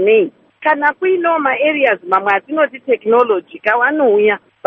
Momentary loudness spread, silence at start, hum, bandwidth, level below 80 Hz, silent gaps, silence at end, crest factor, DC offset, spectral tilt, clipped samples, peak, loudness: 5 LU; 0 s; none; 4.8 kHz; -66 dBFS; none; 0.3 s; 14 dB; under 0.1%; -2 dB/octave; under 0.1%; 0 dBFS; -14 LUFS